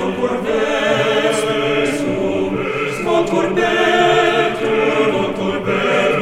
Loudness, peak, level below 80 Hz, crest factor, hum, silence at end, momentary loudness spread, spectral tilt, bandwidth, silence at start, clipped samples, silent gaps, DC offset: -16 LUFS; -2 dBFS; -44 dBFS; 14 dB; none; 0 s; 6 LU; -4.5 dB/octave; 15 kHz; 0 s; under 0.1%; none; under 0.1%